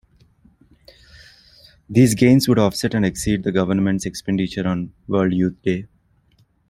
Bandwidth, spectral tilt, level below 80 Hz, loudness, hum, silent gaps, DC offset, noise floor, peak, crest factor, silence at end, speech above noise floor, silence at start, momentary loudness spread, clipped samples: 16 kHz; -6 dB/octave; -46 dBFS; -19 LUFS; none; none; under 0.1%; -59 dBFS; -2 dBFS; 18 dB; 0.85 s; 41 dB; 1.9 s; 10 LU; under 0.1%